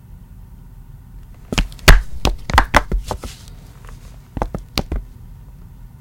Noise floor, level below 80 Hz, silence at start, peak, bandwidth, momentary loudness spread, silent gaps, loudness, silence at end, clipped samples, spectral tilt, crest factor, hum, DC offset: -39 dBFS; -22 dBFS; 0.15 s; 0 dBFS; 17 kHz; 28 LU; none; -19 LUFS; 0.15 s; 0.2%; -4 dB/octave; 20 dB; none; under 0.1%